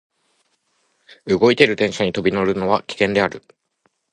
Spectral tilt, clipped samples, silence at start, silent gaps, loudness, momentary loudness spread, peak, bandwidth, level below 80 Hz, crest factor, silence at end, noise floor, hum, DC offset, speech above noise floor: -5.5 dB/octave; under 0.1%; 1.25 s; none; -18 LUFS; 9 LU; 0 dBFS; 11 kHz; -52 dBFS; 20 dB; 0.75 s; -67 dBFS; none; under 0.1%; 49 dB